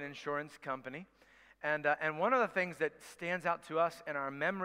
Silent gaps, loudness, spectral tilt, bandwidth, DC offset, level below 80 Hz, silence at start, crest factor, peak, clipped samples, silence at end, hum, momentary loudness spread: none; -36 LUFS; -5 dB/octave; 16 kHz; under 0.1%; -78 dBFS; 0 s; 20 dB; -16 dBFS; under 0.1%; 0 s; none; 11 LU